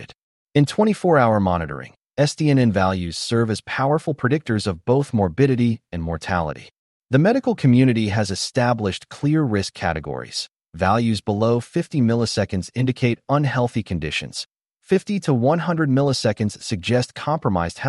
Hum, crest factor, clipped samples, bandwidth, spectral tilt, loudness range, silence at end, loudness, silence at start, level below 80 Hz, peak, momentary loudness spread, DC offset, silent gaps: none; 16 dB; under 0.1%; 11.5 kHz; -6.5 dB/octave; 3 LU; 0 s; -21 LUFS; 0 s; -46 dBFS; -4 dBFS; 9 LU; under 0.1%; 0.18-0.46 s, 6.78-7.01 s